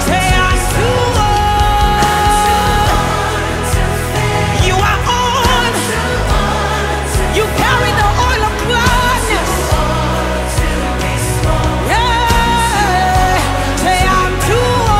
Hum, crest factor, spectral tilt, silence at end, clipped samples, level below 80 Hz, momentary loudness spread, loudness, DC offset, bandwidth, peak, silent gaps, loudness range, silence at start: none; 12 dB; -4 dB/octave; 0 s; under 0.1%; -20 dBFS; 4 LU; -13 LUFS; under 0.1%; 16 kHz; 0 dBFS; none; 2 LU; 0 s